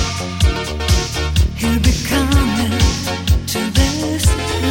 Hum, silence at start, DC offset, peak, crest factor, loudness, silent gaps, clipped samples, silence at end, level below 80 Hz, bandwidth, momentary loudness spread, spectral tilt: none; 0 s; 0.2%; -2 dBFS; 14 dB; -17 LUFS; none; under 0.1%; 0 s; -20 dBFS; 17 kHz; 3 LU; -4.5 dB/octave